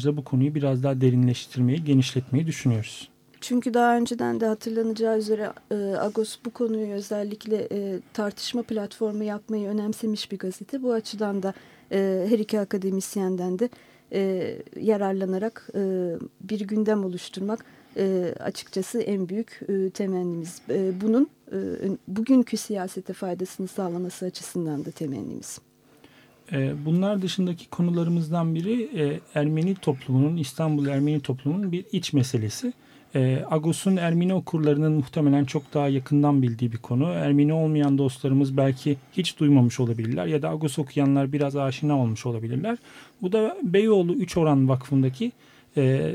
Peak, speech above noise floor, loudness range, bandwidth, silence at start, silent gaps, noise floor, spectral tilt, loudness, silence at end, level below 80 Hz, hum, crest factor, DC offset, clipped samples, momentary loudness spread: -8 dBFS; 31 dB; 6 LU; 15.5 kHz; 0 s; none; -55 dBFS; -7 dB/octave; -25 LUFS; 0 s; -64 dBFS; none; 16 dB; under 0.1%; under 0.1%; 10 LU